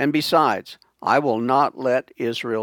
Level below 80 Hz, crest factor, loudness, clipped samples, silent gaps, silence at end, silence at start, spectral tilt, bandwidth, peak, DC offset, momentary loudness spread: -72 dBFS; 18 dB; -21 LUFS; under 0.1%; none; 0 s; 0 s; -5 dB/octave; 19.5 kHz; -2 dBFS; under 0.1%; 9 LU